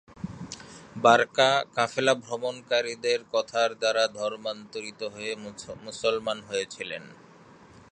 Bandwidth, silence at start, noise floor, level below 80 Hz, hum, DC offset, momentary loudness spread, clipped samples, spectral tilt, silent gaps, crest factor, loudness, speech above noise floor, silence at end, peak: 10.5 kHz; 0.1 s; -52 dBFS; -66 dBFS; none; under 0.1%; 18 LU; under 0.1%; -3 dB/octave; none; 24 dB; -26 LUFS; 25 dB; 0.8 s; -4 dBFS